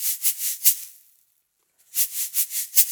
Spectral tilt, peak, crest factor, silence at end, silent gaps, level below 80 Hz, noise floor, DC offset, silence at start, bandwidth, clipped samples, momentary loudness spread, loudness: 7.5 dB/octave; 0 dBFS; 24 dB; 0 s; none; -88 dBFS; -69 dBFS; under 0.1%; 0 s; over 20 kHz; under 0.1%; 10 LU; -20 LUFS